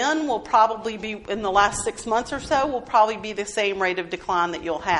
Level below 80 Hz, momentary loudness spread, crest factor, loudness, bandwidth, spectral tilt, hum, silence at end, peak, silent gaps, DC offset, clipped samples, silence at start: -48 dBFS; 9 LU; 18 dB; -23 LUFS; 11.5 kHz; -3 dB/octave; none; 0 s; -4 dBFS; none; under 0.1%; under 0.1%; 0 s